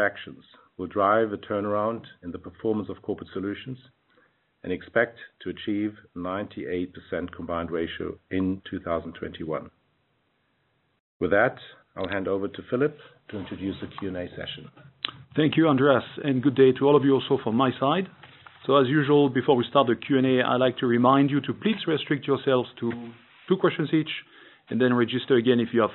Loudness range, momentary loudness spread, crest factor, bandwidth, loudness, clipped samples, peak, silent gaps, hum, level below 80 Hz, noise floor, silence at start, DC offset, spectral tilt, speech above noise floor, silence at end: 10 LU; 16 LU; 20 dB; 4.2 kHz; -25 LUFS; under 0.1%; -4 dBFS; 11.00-11.20 s; none; -62 dBFS; -70 dBFS; 0 s; under 0.1%; -5 dB/octave; 46 dB; 0 s